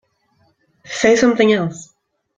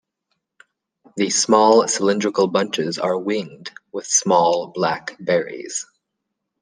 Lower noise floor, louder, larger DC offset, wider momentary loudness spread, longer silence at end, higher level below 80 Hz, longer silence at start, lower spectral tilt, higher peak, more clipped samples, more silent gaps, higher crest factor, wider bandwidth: second, -61 dBFS vs -79 dBFS; first, -15 LUFS vs -19 LUFS; neither; about the same, 16 LU vs 17 LU; second, 0.55 s vs 0.8 s; first, -56 dBFS vs -70 dBFS; second, 0.9 s vs 1.15 s; first, -4.5 dB/octave vs -3 dB/octave; about the same, -2 dBFS vs -2 dBFS; neither; neither; about the same, 16 dB vs 18 dB; second, 9.2 kHz vs 10.5 kHz